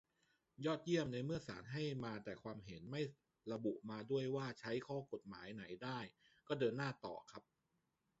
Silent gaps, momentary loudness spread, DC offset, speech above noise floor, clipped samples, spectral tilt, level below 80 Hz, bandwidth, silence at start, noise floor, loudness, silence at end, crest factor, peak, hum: none; 12 LU; under 0.1%; 42 dB; under 0.1%; -5.5 dB/octave; -76 dBFS; 7.6 kHz; 0.6 s; -86 dBFS; -45 LUFS; 0.8 s; 20 dB; -26 dBFS; none